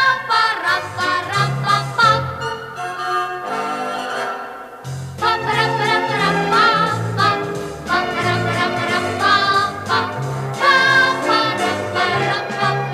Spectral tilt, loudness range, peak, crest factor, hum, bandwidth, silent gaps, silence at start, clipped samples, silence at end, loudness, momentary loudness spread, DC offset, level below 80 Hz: -4 dB/octave; 5 LU; -2 dBFS; 16 dB; none; 15 kHz; none; 0 s; under 0.1%; 0 s; -17 LUFS; 11 LU; under 0.1%; -54 dBFS